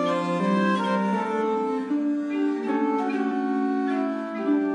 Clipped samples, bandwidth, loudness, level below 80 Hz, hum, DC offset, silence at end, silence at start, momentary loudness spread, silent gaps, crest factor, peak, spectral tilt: under 0.1%; 10 kHz; -25 LUFS; -76 dBFS; none; under 0.1%; 0 s; 0 s; 3 LU; none; 14 dB; -10 dBFS; -7 dB/octave